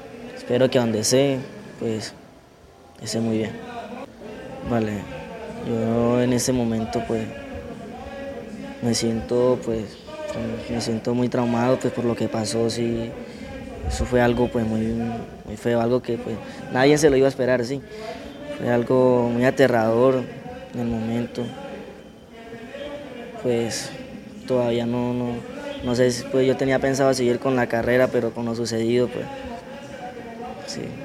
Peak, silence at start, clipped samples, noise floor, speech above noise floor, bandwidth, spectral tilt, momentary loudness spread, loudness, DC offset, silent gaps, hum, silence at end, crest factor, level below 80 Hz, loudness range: -2 dBFS; 0 s; under 0.1%; -49 dBFS; 27 dB; 14.5 kHz; -5.5 dB/octave; 17 LU; -22 LUFS; under 0.1%; none; none; 0 s; 20 dB; -46 dBFS; 8 LU